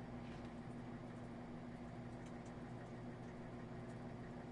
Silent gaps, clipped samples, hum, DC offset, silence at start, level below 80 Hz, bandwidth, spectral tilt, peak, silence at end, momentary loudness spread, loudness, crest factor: none; under 0.1%; 60 Hz at -55 dBFS; under 0.1%; 0 s; -64 dBFS; 11 kHz; -7.5 dB/octave; -40 dBFS; 0 s; 1 LU; -52 LUFS; 12 dB